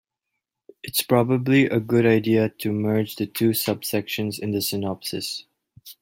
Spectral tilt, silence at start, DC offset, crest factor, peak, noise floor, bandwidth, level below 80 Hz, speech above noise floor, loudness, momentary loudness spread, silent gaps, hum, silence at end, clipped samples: -5.5 dB/octave; 0.85 s; under 0.1%; 18 dB; -4 dBFS; -82 dBFS; 16.5 kHz; -62 dBFS; 60 dB; -22 LUFS; 9 LU; none; none; 0.1 s; under 0.1%